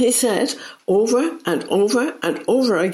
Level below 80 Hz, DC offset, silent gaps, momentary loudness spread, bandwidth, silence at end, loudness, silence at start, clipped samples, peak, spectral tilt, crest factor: -68 dBFS; under 0.1%; none; 7 LU; 15.5 kHz; 0 s; -19 LUFS; 0 s; under 0.1%; -4 dBFS; -3.5 dB/octave; 16 dB